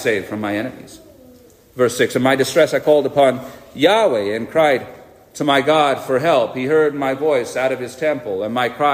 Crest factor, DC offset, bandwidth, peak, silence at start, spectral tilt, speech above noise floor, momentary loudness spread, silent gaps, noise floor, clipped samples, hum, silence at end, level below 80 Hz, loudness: 16 dB; under 0.1%; 15.5 kHz; -2 dBFS; 0 s; -4.5 dB/octave; 29 dB; 9 LU; none; -46 dBFS; under 0.1%; none; 0 s; -58 dBFS; -17 LUFS